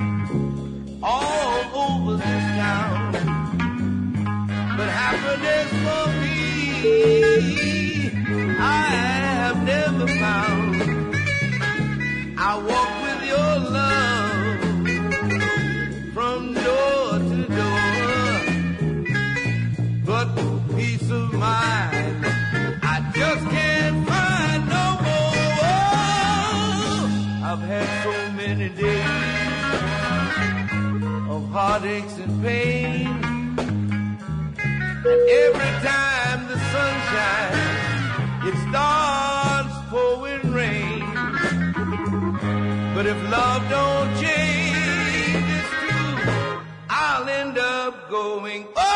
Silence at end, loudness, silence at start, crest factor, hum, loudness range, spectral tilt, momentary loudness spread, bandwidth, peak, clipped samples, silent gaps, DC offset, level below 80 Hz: 0 s; -21 LUFS; 0 s; 16 dB; none; 4 LU; -5.5 dB/octave; 6 LU; 10.5 kHz; -6 dBFS; under 0.1%; none; under 0.1%; -44 dBFS